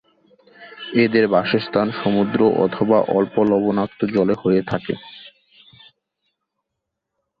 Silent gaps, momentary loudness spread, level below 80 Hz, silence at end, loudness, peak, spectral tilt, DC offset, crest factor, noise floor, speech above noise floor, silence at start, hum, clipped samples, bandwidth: none; 9 LU; -58 dBFS; 2.1 s; -19 LUFS; -2 dBFS; -9 dB/octave; under 0.1%; 18 dB; -80 dBFS; 62 dB; 0.6 s; none; under 0.1%; 5.2 kHz